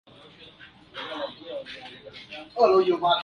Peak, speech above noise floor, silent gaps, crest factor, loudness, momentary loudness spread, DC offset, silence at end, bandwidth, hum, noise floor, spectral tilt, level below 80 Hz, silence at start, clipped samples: -6 dBFS; 28 dB; none; 20 dB; -25 LUFS; 23 LU; under 0.1%; 0 s; 7 kHz; none; -50 dBFS; -5.5 dB/octave; -66 dBFS; 0.4 s; under 0.1%